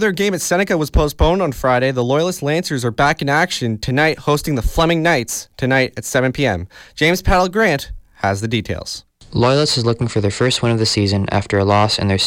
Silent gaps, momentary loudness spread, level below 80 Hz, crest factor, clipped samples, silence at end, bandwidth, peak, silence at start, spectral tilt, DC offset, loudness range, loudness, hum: none; 7 LU; -30 dBFS; 14 dB; under 0.1%; 0 s; 16.5 kHz; -4 dBFS; 0 s; -4.5 dB/octave; under 0.1%; 1 LU; -17 LUFS; none